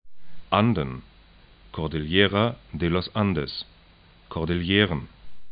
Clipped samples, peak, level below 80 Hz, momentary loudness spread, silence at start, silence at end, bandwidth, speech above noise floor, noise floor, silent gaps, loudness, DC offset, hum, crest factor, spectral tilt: under 0.1%; -4 dBFS; -46 dBFS; 15 LU; 0.05 s; 0 s; 5.2 kHz; 30 dB; -54 dBFS; none; -25 LUFS; under 0.1%; none; 22 dB; -10.5 dB/octave